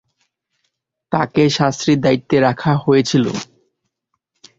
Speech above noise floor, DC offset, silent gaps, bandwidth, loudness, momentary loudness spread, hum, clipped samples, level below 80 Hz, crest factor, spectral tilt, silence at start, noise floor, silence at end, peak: 58 dB; under 0.1%; none; 7.8 kHz; -16 LUFS; 8 LU; none; under 0.1%; -52 dBFS; 16 dB; -6 dB/octave; 1.1 s; -73 dBFS; 1.15 s; -2 dBFS